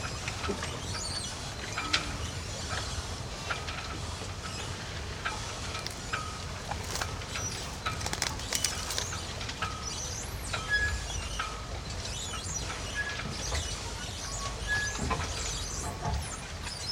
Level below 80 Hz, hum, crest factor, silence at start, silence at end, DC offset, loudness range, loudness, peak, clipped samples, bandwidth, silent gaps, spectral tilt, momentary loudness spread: -42 dBFS; none; 28 dB; 0 s; 0 s; under 0.1%; 4 LU; -34 LUFS; -8 dBFS; under 0.1%; 19.5 kHz; none; -2.5 dB/octave; 7 LU